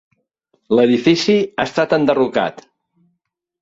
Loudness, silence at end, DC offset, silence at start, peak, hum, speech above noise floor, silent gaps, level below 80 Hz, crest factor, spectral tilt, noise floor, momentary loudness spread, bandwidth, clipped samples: -16 LUFS; 1 s; under 0.1%; 0.7 s; -2 dBFS; none; 58 dB; none; -58 dBFS; 16 dB; -5.5 dB/octave; -73 dBFS; 6 LU; 7.8 kHz; under 0.1%